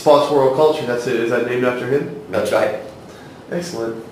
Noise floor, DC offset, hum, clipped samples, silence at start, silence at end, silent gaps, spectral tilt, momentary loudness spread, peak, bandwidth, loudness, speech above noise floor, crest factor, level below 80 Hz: -38 dBFS; under 0.1%; none; under 0.1%; 0 s; 0 s; none; -5.5 dB/octave; 18 LU; 0 dBFS; 16 kHz; -18 LUFS; 20 dB; 18 dB; -58 dBFS